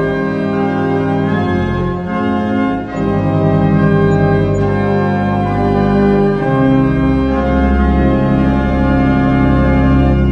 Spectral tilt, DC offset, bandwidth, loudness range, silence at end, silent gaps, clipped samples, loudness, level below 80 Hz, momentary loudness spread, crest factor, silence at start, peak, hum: -9.5 dB/octave; under 0.1%; 7.4 kHz; 2 LU; 0 s; none; under 0.1%; -13 LUFS; -22 dBFS; 5 LU; 12 dB; 0 s; 0 dBFS; none